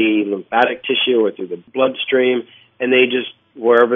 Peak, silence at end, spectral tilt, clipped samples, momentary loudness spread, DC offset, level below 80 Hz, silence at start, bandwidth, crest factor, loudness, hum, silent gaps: 0 dBFS; 0 s; -6.5 dB/octave; under 0.1%; 10 LU; under 0.1%; -70 dBFS; 0 s; 3.9 kHz; 16 dB; -17 LUFS; none; none